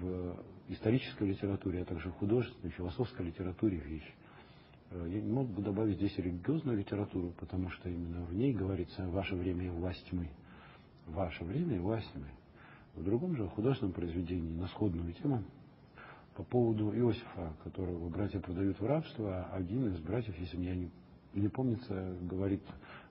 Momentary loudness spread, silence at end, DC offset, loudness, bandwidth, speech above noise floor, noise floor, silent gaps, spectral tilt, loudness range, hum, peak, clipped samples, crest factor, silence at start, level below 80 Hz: 15 LU; 0 s; under 0.1%; -37 LUFS; 5.6 kHz; 22 dB; -58 dBFS; none; -8 dB/octave; 3 LU; none; -18 dBFS; under 0.1%; 20 dB; 0 s; -52 dBFS